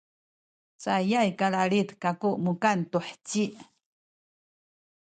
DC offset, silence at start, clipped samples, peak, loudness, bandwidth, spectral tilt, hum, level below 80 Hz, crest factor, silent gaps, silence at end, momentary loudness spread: under 0.1%; 0.8 s; under 0.1%; -8 dBFS; -27 LUFS; 9.2 kHz; -5.5 dB/octave; none; -74 dBFS; 20 dB; none; 1.4 s; 8 LU